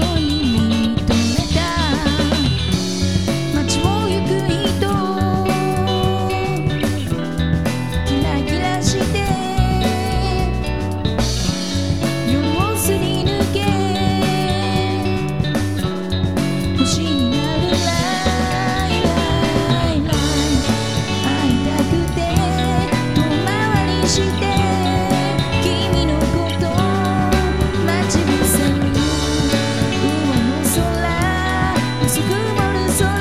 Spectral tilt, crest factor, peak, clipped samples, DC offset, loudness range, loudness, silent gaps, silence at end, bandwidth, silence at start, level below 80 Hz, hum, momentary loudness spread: -5 dB/octave; 14 dB; -2 dBFS; under 0.1%; 2%; 2 LU; -18 LUFS; none; 0 s; 16 kHz; 0 s; -28 dBFS; none; 3 LU